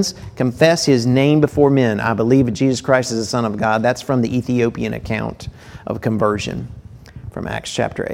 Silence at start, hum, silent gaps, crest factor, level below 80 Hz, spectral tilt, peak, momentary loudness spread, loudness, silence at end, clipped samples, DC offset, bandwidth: 0 s; none; none; 18 dB; -42 dBFS; -6 dB/octave; 0 dBFS; 14 LU; -17 LUFS; 0 s; under 0.1%; under 0.1%; 16 kHz